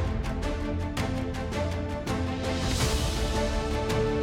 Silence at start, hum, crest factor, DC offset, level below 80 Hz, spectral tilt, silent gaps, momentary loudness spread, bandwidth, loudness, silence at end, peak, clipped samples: 0 s; none; 14 dB; under 0.1%; -34 dBFS; -5 dB/octave; none; 5 LU; 16.5 kHz; -29 LUFS; 0 s; -14 dBFS; under 0.1%